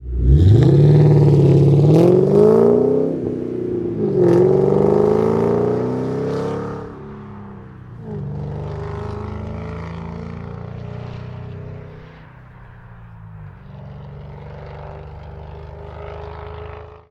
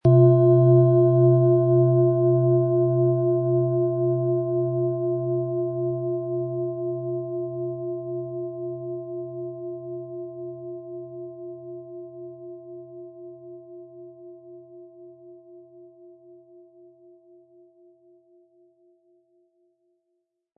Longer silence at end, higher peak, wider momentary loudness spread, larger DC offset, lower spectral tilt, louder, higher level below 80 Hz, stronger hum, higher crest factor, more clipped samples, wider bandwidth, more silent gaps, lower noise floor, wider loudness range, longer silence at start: second, 0.15 s vs 4.7 s; first, 0 dBFS vs -6 dBFS; about the same, 24 LU vs 24 LU; neither; second, -10 dB/octave vs -14.5 dB/octave; first, -15 LUFS vs -22 LUFS; first, -32 dBFS vs -66 dBFS; neither; about the same, 16 dB vs 18 dB; neither; first, 7.2 kHz vs 1.6 kHz; neither; second, -41 dBFS vs -77 dBFS; about the same, 23 LU vs 24 LU; about the same, 0 s vs 0.05 s